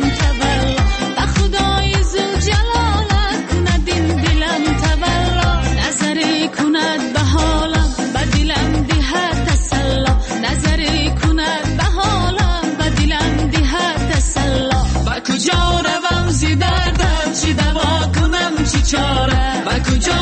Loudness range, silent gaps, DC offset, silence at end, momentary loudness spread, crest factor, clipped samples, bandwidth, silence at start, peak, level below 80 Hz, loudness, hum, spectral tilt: 1 LU; none; under 0.1%; 0 s; 2 LU; 12 dB; under 0.1%; 8.8 kHz; 0 s; -4 dBFS; -20 dBFS; -16 LUFS; none; -4.5 dB/octave